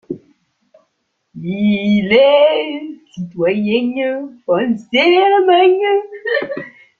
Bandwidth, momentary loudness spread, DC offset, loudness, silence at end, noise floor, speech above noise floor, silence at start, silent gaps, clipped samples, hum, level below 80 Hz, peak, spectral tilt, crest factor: 7 kHz; 18 LU; under 0.1%; -14 LUFS; 0.3 s; -69 dBFS; 55 dB; 0.1 s; none; under 0.1%; none; -58 dBFS; 0 dBFS; -7 dB/octave; 14 dB